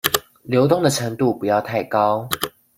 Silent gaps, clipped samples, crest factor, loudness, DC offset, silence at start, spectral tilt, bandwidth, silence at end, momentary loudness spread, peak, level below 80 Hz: none; under 0.1%; 20 dB; -20 LUFS; under 0.1%; 0.05 s; -4.5 dB/octave; 16.5 kHz; 0.3 s; 7 LU; 0 dBFS; -56 dBFS